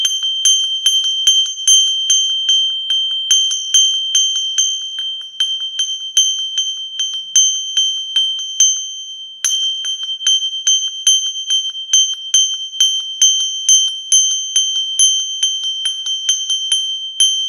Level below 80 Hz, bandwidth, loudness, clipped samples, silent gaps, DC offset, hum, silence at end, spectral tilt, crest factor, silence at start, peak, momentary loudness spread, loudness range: -62 dBFS; 16.5 kHz; -13 LUFS; under 0.1%; none; under 0.1%; none; 0 s; 7.5 dB/octave; 16 dB; 0 s; 0 dBFS; 7 LU; 3 LU